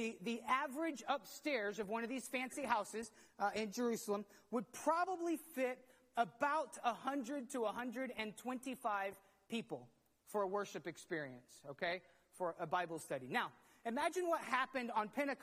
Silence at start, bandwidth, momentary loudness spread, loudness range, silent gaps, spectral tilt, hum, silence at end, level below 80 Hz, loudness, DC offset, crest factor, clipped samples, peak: 0 s; 15 kHz; 9 LU; 4 LU; none; -4 dB/octave; none; 0 s; -84 dBFS; -42 LUFS; under 0.1%; 22 dB; under 0.1%; -20 dBFS